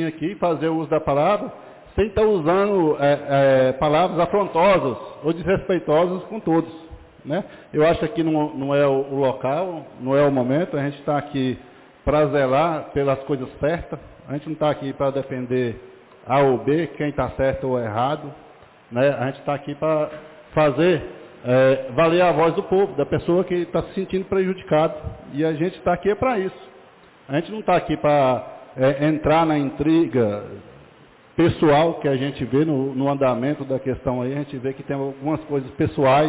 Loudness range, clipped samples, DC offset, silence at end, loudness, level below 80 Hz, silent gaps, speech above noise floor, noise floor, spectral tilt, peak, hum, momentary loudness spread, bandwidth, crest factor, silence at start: 4 LU; under 0.1%; under 0.1%; 0 s; -21 LUFS; -46 dBFS; none; 29 dB; -50 dBFS; -11 dB/octave; -10 dBFS; none; 10 LU; 4 kHz; 12 dB; 0 s